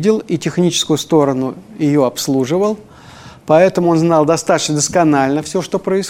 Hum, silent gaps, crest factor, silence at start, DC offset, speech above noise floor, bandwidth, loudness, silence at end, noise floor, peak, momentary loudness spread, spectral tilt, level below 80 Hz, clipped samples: none; none; 14 dB; 0 s; under 0.1%; 24 dB; 16.5 kHz; -14 LUFS; 0 s; -38 dBFS; 0 dBFS; 7 LU; -5 dB/octave; -52 dBFS; under 0.1%